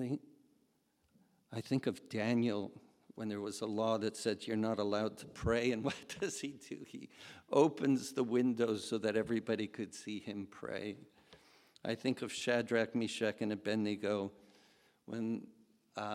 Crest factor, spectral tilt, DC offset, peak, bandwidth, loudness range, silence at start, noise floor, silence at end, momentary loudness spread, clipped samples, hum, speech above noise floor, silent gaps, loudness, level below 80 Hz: 22 dB; -5.5 dB/octave; under 0.1%; -16 dBFS; 14.5 kHz; 5 LU; 0 s; -76 dBFS; 0 s; 13 LU; under 0.1%; none; 40 dB; none; -37 LUFS; -66 dBFS